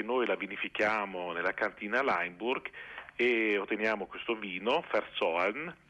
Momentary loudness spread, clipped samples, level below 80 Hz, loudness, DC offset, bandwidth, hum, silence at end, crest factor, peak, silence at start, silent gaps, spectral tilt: 7 LU; under 0.1%; -70 dBFS; -32 LUFS; under 0.1%; 9.2 kHz; none; 0.15 s; 14 dB; -18 dBFS; 0 s; none; -5 dB/octave